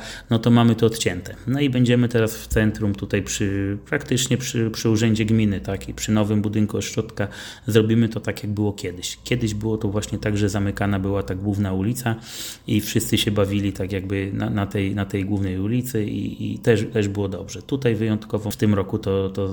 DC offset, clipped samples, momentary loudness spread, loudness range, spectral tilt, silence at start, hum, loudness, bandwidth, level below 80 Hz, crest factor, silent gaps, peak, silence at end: under 0.1%; under 0.1%; 9 LU; 2 LU; -5.5 dB/octave; 0 s; none; -22 LUFS; 18 kHz; -44 dBFS; 22 dB; none; 0 dBFS; 0 s